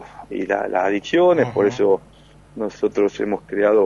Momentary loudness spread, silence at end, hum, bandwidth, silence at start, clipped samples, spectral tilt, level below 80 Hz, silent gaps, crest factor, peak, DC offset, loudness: 13 LU; 0 s; none; 7.4 kHz; 0 s; under 0.1%; -6 dB/octave; -54 dBFS; none; 14 dB; -4 dBFS; under 0.1%; -20 LUFS